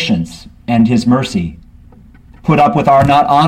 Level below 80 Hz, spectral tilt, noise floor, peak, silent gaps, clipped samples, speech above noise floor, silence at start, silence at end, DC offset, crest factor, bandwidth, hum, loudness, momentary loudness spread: -38 dBFS; -7 dB/octave; -40 dBFS; 0 dBFS; none; under 0.1%; 29 dB; 0 s; 0 s; under 0.1%; 12 dB; 13 kHz; 60 Hz at -35 dBFS; -12 LUFS; 15 LU